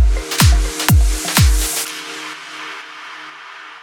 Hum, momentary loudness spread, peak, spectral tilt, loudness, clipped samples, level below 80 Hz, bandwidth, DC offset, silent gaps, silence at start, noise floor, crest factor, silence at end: none; 18 LU; 0 dBFS; -3.5 dB/octave; -16 LUFS; under 0.1%; -18 dBFS; 19 kHz; under 0.1%; none; 0 s; -35 dBFS; 16 dB; 0.05 s